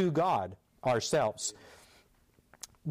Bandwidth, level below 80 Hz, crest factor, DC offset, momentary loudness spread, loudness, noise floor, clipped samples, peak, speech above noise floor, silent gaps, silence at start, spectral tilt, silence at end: 15.5 kHz; -68 dBFS; 12 dB; under 0.1%; 20 LU; -32 LUFS; -67 dBFS; under 0.1%; -20 dBFS; 36 dB; none; 0 s; -4.5 dB/octave; 0 s